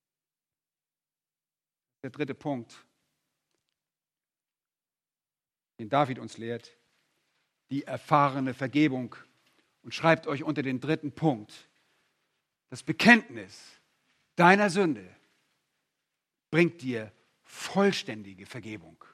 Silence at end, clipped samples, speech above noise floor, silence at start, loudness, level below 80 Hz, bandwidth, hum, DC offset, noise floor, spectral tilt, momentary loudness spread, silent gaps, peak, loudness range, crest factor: 0.35 s; under 0.1%; over 62 dB; 2.05 s; -27 LUFS; -76 dBFS; 14 kHz; none; under 0.1%; under -90 dBFS; -5.5 dB/octave; 22 LU; none; -4 dBFS; 16 LU; 28 dB